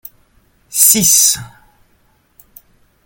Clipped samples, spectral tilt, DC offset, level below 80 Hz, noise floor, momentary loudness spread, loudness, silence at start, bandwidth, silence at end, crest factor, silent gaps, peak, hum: under 0.1%; -1 dB/octave; under 0.1%; -52 dBFS; -56 dBFS; 14 LU; -9 LUFS; 0.7 s; over 20 kHz; 1.6 s; 18 dB; none; 0 dBFS; none